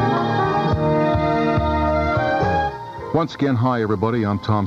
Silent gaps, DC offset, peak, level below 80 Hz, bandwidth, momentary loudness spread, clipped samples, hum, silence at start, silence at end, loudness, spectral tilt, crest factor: none; under 0.1%; -6 dBFS; -34 dBFS; 7.6 kHz; 4 LU; under 0.1%; none; 0 s; 0 s; -20 LUFS; -8 dB/octave; 12 dB